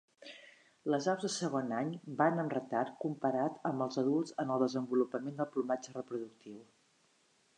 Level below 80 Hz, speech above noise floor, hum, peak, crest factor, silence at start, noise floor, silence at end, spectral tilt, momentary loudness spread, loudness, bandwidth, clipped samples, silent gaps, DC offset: -88 dBFS; 37 dB; none; -14 dBFS; 22 dB; 0.2 s; -72 dBFS; 0.95 s; -5.5 dB/octave; 18 LU; -35 LUFS; 10.5 kHz; under 0.1%; none; under 0.1%